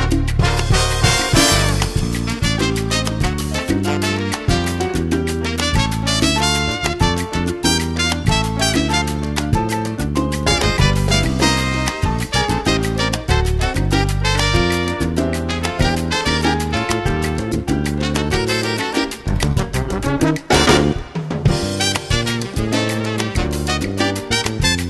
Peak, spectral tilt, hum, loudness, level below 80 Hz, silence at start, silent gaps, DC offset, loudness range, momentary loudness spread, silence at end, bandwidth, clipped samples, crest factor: 0 dBFS; -4.5 dB/octave; none; -18 LUFS; -26 dBFS; 0 s; none; under 0.1%; 2 LU; 6 LU; 0 s; 13 kHz; under 0.1%; 16 dB